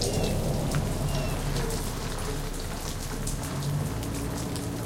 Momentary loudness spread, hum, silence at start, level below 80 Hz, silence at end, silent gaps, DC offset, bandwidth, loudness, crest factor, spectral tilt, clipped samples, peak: 6 LU; none; 0 s; -34 dBFS; 0 s; none; under 0.1%; 17 kHz; -31 LUFS; 18 dB; -5 dB/octave; under 0.1%; -10 dBFS